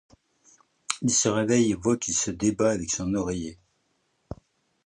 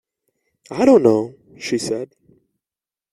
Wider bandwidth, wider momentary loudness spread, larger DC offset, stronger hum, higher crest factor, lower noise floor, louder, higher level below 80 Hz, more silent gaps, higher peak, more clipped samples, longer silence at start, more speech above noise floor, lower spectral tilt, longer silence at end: second, 11 kHz vs 12.5 kHz; first, 22 LU vs 19 LU; neither; neither; about the same, 22 dB vs 20 dB; second, -72 dBFS vs under -90 dBFS; second, -25 LUFS vs -17 LUFS; first, -52 dBFS vs -60 dBFS; neither; second, -6 dBFS vs -2 dBFS; neither; first, 0.9 s vs 0.7 s; second, 47 dB vs over 74 dB; second, -4 dB/octave vs -5.5 dB/octave; second, 0.5 s vs 1.05 s